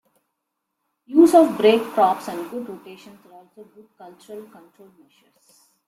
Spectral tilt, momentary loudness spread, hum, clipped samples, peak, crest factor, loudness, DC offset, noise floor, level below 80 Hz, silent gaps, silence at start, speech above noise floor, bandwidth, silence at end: -5 dB/octave; 26 LU; none; under 0.1%; -2 dBFS; 20 dB; -18 LUFS; under 0.1%; -79 dBFS; -68 dBFS; none; 1.1 s; 58 dB; 15.5 kHz; 1.45 s